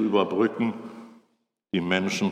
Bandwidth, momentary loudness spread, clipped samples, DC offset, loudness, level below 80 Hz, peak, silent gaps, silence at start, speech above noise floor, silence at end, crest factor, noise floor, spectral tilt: 13.5 kHz; 18 LU; under 0.1%; under 0.1%; -25 LUFS; -70 dBFS; -8 dBFS; none; 0 s; 47 dB; 0 s; 20 dB; -71 dBFS; -5.5 dB/octave